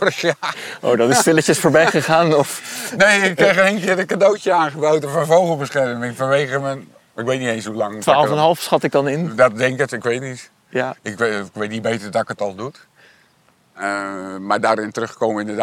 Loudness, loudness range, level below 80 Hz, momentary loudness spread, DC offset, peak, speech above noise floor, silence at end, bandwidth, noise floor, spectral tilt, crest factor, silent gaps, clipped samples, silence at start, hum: -17 LUFS; 9 LU; -62 dBFS; 12 LU; under 0.1%; -2 dBFS; 40 dB; 0 s; 18.5 kHz; -57 dBFS; -4.5 dB/octave; 16 dB; none; under 0.1%; 0 s; none